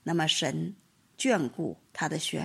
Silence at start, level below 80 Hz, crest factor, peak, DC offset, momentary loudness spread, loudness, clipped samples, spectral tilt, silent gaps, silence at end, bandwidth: 0.05 s; -72 dBFS; 18 dB; -12 dBFS; under 0.1%; 10 LU; -30 LUFS; under 0.1%; -4 dB/octave; none; 0 s; 14.5 kHz